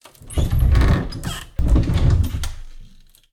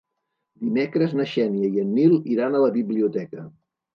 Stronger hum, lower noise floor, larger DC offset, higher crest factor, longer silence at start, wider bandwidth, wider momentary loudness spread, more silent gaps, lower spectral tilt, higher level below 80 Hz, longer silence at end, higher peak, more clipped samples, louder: neither; second, -45 dBFS vs -79 dBFS; neither; about the same, 14 dB vs 16 dB; second, 0.2 s vs 0.6 s; first, 15.5 kHz vs 6.6 kHz; about the same, 12 LU vs 12 LU; neither; second, -6.5 dB/octave vs -9 dB/octave; first, -20 dBFS vs -74 dBFS; about the same, 0.45 s vs 0.45 s; about the same, -4 dBFS vs -6 dBFS; neither; about the same, -20 LUFS vs -22 LUFS